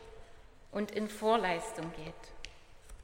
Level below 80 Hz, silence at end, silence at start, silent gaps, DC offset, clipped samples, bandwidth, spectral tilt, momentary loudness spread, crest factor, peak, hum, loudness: -56 dBFS; 0 s; 0 s; none; under 0.1%; under 0.1%; 16 kHz; -4.5 dB/octave; 21 LU; 22 dB; -16 dBFS; none; -35 LUFS